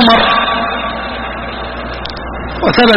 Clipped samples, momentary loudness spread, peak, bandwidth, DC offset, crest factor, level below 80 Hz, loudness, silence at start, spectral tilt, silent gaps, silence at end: under 0.1%; 13 LU; 0 dBFS; 6.2 kHz; under 0.1%; 14 dB; -30 dBFS; -15 LUFS; 0 s; -6 dB/octave; none; 0 s